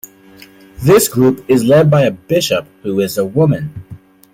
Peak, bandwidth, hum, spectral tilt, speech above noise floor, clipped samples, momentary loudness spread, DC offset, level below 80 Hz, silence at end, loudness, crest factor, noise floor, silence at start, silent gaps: 0 dBFS; 16.5 kHz; none; -5.5 dB/octave; 29 dB; under 0.1%; 11 LU; under 0.1%; -46 dBFS; 0.4 s; -13 LUFS; 14 dB; -41 dBFS; 0.8 s; none